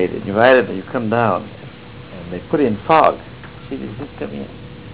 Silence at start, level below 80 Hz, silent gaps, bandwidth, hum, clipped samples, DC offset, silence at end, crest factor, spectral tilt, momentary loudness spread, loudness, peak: 0 s; -46 dBFS; none; 4 kHz; none; under 0.1%; 0.5%; 0 s; 18 dB; -10 dB/octave; 23 LU; -17 LUFS; 0 dBFS